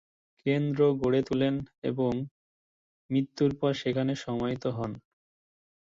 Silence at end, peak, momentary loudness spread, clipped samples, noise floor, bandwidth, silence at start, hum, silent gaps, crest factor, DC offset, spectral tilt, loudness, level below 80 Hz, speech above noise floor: 0.95 s; -12 dBFS; 10 LU; under 0.1%; under -90 dBFS; 7.6 kHz; 0.45 s; none; 1.78-1.82 s, 2.31-3.09 s; 18 dB; under 0.1%; -7.5 dB/octave; -29 LUFS; -60 dBFS; over 62 dB